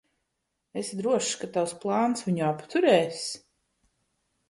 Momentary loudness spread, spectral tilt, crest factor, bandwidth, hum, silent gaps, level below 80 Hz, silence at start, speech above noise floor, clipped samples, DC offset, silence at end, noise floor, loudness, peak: 13 LU; -4.5 dB/octave; 22 dB; 11.5 kHz; none; none; -72 dBFS; 0.75 s; 54 dB; under 0.1%; under 0.1%; 1.15 s; -80 dBFS; -27 LUFS; -8 dBFS